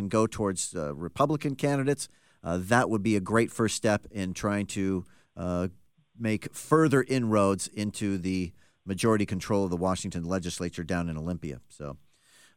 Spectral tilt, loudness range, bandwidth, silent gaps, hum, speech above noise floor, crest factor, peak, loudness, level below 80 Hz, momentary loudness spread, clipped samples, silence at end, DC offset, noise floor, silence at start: -5.5 dB/octave; 3 LU; 16.5 kHz; none; none; 33 dB; 20 dB; -8 dBFS; -29 LUFS; -58 dBFS; 13 LU; under 0.1%; 0.6 s; 0.2%; -61 dBFS; 0 s